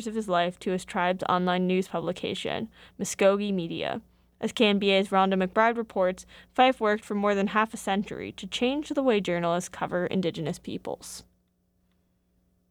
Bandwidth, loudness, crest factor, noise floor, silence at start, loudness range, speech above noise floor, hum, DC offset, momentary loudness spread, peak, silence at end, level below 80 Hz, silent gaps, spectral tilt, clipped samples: 15.5 kHz; -27 LUFS; 18 dB; -70 dBFS; 0 s; 5 LU; 44 dB; none; under 0.1%; 13 LU; -8 dBFS; 1.5 s; -60 dBFS; none; -5 dB/octave; under 0.1%